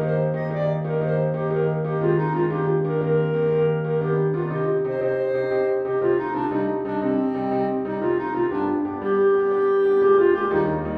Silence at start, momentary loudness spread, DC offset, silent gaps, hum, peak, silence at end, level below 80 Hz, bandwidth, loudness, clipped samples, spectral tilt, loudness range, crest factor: 0 s; 5 LU; under 0.1%; none; none; -8 dBFS; 0 s; -54 dBFS; 4.5 kHz; -22 LUFS; under 0.1%; -10.5 dB/octave; 3 LU; 14 dB